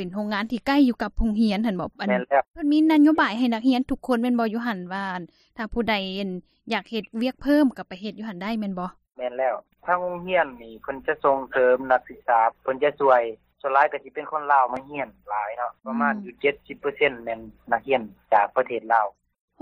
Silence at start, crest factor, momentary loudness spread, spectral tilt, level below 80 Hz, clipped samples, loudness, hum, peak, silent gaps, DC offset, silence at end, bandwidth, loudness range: 0 s; 18 dB; 12 LU; -6.5 dB/octave; -46 dBFS; under 0.1%; -24 LUFS; none; -6 dBFS; none; under 0.1%; 0.5 s; 13.5 kHz; 5 LU